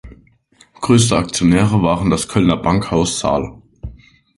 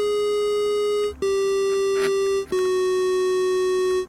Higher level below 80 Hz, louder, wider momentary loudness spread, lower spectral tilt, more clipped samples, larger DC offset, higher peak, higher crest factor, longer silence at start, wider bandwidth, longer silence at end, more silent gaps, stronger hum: first, -36 dBFS vs -52 dBFS; first, -15 LUFS vs -22 LUFS; first, 21 LU vs 2 LU; first, -5.5 dB/octave vs -3.5 dB/octave; neither; neither; first, 0 dBFS vs -12 dBFS; first, 16 dB vs 10 dB; about the same, 0.05 s vs 0 s; second, 11.5 kHz vs 14.5 kHz; first, 0.45 s vs 0 s; neither; neither